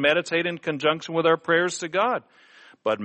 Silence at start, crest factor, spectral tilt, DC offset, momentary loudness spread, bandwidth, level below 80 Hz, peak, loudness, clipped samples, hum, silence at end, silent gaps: 0 s; 18 dB; -4 dB/octave; under 0.1%; 7 LU; 8.6 kHz; -72 dBFS; -6 dBFS; -24 LUFS; under 0.1%; none; 0 s; none